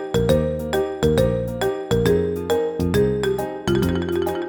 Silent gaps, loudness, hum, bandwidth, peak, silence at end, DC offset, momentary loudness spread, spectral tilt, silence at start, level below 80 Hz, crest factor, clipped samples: none; -21 LUFS; none; over 20 kHz; -4 dBFS; 0 s; under 0.1%; 5 LU; -6.5 dB/octave; 0 s; -36 dBFS; 16 dB; under 0.1%